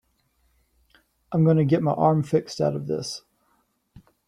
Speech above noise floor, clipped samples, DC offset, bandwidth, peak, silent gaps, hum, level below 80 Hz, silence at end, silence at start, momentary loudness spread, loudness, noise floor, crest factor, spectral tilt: 47 dB; under 0.1%; under 0.1%; 11 kHz; -6 dBFS; none; none; -60 dBFS; 1.1 s; 1.3 s; 10 LU; -23 LUFS; -68 dBFS; 20 dB; -7.5 dB/octave